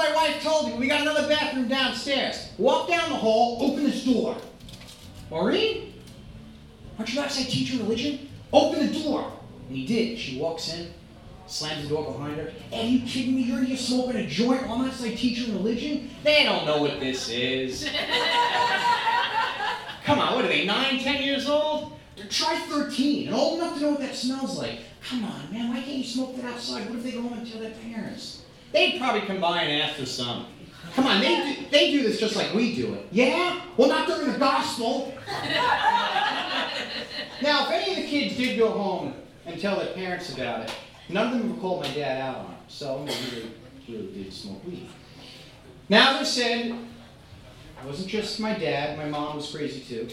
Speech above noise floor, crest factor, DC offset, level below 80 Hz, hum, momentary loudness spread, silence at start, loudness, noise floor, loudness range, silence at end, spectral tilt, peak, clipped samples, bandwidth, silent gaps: 22 dB; 24 dB; under 0.1%; -56 dBFS; none; 16 LU; 0 s; -25 LUFS; -47 dBFS; 7 LU; 0 s; -4 dB/octave; -2 dBFS; under 0.1%; 15.5 kHz; none